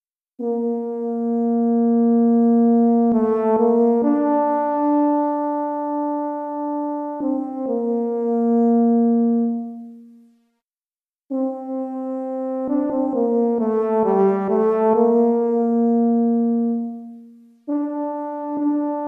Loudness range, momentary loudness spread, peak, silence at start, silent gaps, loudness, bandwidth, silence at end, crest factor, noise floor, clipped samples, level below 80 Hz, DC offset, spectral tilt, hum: 7 LU; 10 LU; -6 dBFS; 0.4 s; 10.63-11.13 s; -20 LUFS; 2.6 kHz; 0 s; 14 dB; under -90 dBFS; under 0.1%; -68 dBFS; under 0.1%; -11 dB/octave; none